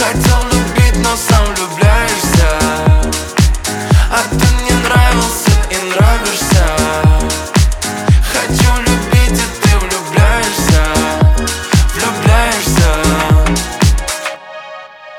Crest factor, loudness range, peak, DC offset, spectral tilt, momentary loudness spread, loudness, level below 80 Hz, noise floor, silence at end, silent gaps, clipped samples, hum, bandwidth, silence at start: 10 dB; 1 LU; 0 dBFS; under 0.1%; -4.5 dB/octave; 4 LU; -12 LUFS; -14 dBFS; -31 dBFS; 0 s; none; under 0.1%; none; 17.5 kHz; 0 s